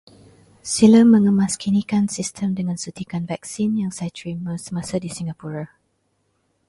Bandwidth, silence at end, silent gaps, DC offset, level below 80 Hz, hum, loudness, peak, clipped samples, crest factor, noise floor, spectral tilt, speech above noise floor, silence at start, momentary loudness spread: 11.5 kHz; 1 s; none; under 0.1%; -56 dBFS; none; -20 LUFS; -2 dBFS; under 0.1%; 18 dB; -68 dBFS; -5.5 dB/octave; 49 dB; 0.65 s; 17 LU